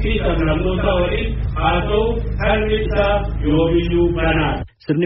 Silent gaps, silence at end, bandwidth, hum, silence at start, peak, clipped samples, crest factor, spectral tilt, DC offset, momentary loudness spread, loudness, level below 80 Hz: none; 0 s; 5.8 kHz; none; 0 s; -4 dBFS; under 0.1%; 14 dB; -5.5 dB/octave; under 0.1%; 5 LU; -18 LUFS; -24 dBFS